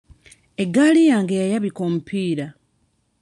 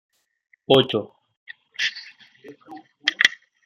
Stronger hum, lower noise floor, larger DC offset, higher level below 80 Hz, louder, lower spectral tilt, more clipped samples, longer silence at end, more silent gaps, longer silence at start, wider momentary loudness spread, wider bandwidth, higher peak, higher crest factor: neither; first, -66 dBFS vs -45 dBFS; neither; first, -62 dBFS vs -68 dBFS; about the same, -19 LUFS vs -21 LUFS; first, -6 dB/octave vs -3.5 dB/octave; neither; first, 0.7 s vs 0.35 s; second, none vs 1.37-1.46 s; about the same, 0.6 s vs 0.7 s; second, 13 LU vs 25 LU; second, 11 kHz vs 15 kHz; second, -6 dBFS vs -2 dBFS; second, 16 dB vs 24 dB